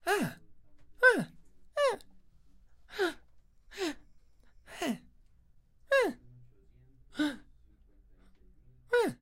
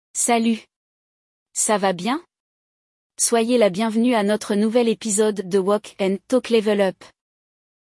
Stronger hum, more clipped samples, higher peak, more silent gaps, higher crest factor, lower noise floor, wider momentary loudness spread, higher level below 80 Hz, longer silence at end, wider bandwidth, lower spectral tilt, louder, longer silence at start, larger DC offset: neither; neither; second, -10 dBFS vs -6 dBFS; second, none vs 0.76-1.46 s, 2.40-3.10 s; first, 24 dB vs 16 dB; second, -62 dBFS vs under -90 dBFS; first, 25 LU vs 6 LU; first, -62 dBFS vs -70 dBFS; second, 0.1 s vs 0.8 s; first, 16 kHz vs 12 kHz; about the same, -4 dB/octave vs -4 dB/octave; second, -32 LUFS vs -20 LUFS; about the same, 0.05 s vs 0.15 s; neither